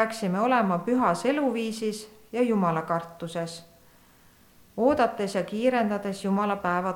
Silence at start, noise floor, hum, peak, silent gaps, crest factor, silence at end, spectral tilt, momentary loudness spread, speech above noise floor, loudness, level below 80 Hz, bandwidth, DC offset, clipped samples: 0 s; -57 dBFS; none; -8 dBFS; none; 18 dB; 0 s; -6 dB/octave; 11 LU; 31 dB; -26 LUFS; -64 dBFS; 18.5 kHz; under 0.1%; under 0.1%